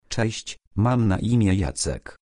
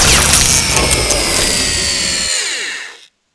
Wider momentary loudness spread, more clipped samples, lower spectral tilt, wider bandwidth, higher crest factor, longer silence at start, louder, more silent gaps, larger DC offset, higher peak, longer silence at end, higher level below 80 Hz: second, 8 LU vs 12 LU; second, under 0.1% vs 0.2%; first, -5.5 dB/octave vs -1.5 dB/octave; about the same, 10.5 kHz vs 11 kHz; about the same, 16 dB vs 14 dB; about the same, 0.1 s vs 0 s; second, -23 LUFS vs -11 LUFS; first, 0.67-0.71 s vs none; neither; second, -8 dBFS vs 0 dBFS; second, 0.1 s vs 0.4 s; second, -40 dBFS vs -26 dBFS